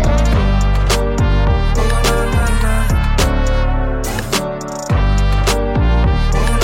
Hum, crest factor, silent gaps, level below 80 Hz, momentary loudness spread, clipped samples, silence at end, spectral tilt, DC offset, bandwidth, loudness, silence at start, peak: none; 10 dB; none; -16 dBFS; 4 LU; under 0.1%; 0 s; -5.5 dB/octave; under 0.1%; 16.5 kHz; -16 LUFS; 0 s; -2 dBFS